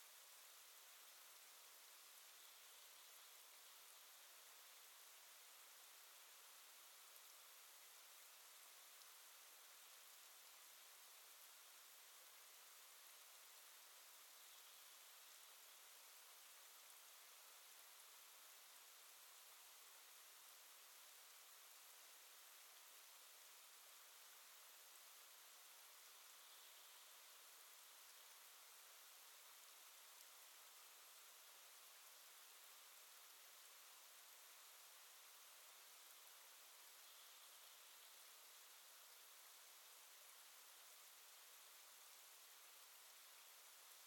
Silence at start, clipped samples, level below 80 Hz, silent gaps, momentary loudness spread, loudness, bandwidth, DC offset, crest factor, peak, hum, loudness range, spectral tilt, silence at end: 0 s; under 0.1%; under -90 dBFS; none; 0 LU; -62 LUFS; 18 kHz; under 0.1%; 22 dB; -42 dBFS; none; 0 LU; 4 dB/octave; 0 s